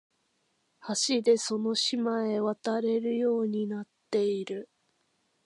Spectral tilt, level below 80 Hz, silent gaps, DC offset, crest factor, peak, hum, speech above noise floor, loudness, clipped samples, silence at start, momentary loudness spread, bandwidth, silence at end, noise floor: -3.5 dB/octave; -86 dBFS; none; under 0.1%; 18 dB; -12 dBFS; none; 46 dB; -29 LUFS; under 0.1%; 0.85 s; 10 LU; 11.5 kHz; 0.8 s; -74 dBFS